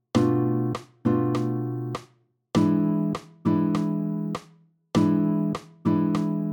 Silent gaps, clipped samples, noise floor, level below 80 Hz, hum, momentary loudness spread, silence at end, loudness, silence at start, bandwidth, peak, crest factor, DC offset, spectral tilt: none; under 0.1%; -61 dBFS; -60 dBFS; none; 8 LU; 0 s; -25 LUFS; 0.15 s; 19 kHz; -8 dBFS; 16 dB; under 0.1%; -8 dB/octave